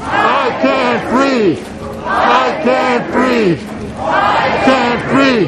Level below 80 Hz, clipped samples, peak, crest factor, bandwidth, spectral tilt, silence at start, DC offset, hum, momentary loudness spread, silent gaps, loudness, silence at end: -40 dBFS; under 0.1%; 0 dBFS; 12 dB; 12 kHz; -5.5 dB/octave; 0 s; under 0.1%; none; 9 LU; none; -13 LUFS; 0 s